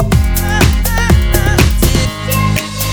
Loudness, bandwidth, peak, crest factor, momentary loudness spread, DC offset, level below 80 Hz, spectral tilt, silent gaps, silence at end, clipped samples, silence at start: -12 LUFS; over 20 kHz; 0 dBFS; 12 dB; 4 LU; under 0.1%; -14 dBFS; -4.5 dB/octave; none; 0 s; 0.1%; 0 s